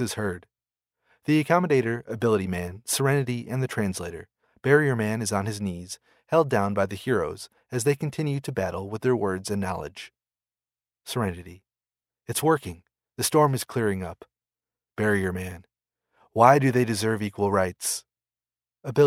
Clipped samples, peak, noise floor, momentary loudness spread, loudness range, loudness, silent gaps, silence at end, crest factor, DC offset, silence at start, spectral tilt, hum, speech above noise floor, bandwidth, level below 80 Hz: under 0.1%; -2 dBFS; under -90 dBFS; 17 LU; 6 LU; -25 LUFS; none; 0 s; 24 dB; under 0.1%; 0 s; -5.5 dB/octave; none; over 65 dB; 16 kHz; -58 dBFS